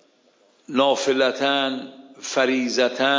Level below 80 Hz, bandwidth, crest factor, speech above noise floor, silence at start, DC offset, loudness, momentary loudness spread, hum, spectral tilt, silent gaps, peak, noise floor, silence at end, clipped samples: -78 dBFS; 7.6 kHz; 16 dB; 39 dB; 0.7 s; under 0.1%; -21 LUFS; 12 LU; none; -2.5 dB/octave; none; -6 dBFS; -59 dBFS; 0 s; under 0.1%